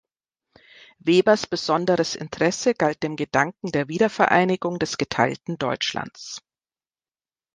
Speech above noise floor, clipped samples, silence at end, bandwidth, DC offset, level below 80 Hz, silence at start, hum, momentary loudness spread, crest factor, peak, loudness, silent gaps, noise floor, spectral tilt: over 68 dB; under 0.1%; 1.15 s; 10 kHz; under 0.1%; -60 dBFS; 1.05 s; none; 10 LU; 22 dB; -2 dBFS; -22 LUFS; none; under -90 dBFS; -4.5 dB/octave